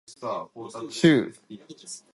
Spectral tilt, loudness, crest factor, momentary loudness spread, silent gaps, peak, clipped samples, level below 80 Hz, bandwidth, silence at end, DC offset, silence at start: -5.5 dB/octave; -24 LUFS; 22 dB; 23 LU; none; -4 dBFS; under 0.1%; -64 dBFS; 11.5 kHz; 0.15 s; under 0.1%; 0.1 s